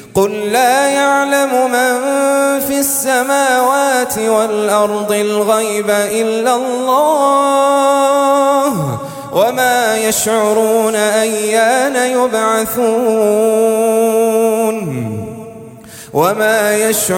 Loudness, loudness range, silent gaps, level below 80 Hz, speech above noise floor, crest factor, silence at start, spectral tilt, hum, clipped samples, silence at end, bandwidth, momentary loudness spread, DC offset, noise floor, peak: -13 LUFS; 2 LU; none; -54 dBFS; 21 dB; 12 dB; 0 s; -3.5 dB/octave; none; under 0.1%; 0 s; 17 kHz; 5 LU; under 0.1%; -33 dBFS; 0 dBFS